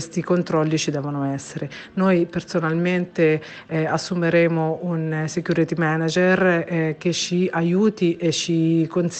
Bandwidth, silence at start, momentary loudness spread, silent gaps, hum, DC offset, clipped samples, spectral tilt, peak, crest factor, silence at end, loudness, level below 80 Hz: 8.8 kHz; 0 s; 7 LU; none; none; under 0.1%; under 0.1%; -5.5 dB/octave; -6 dBFS; 16 dB; 0 s; -21 LUFS; -60 dBFS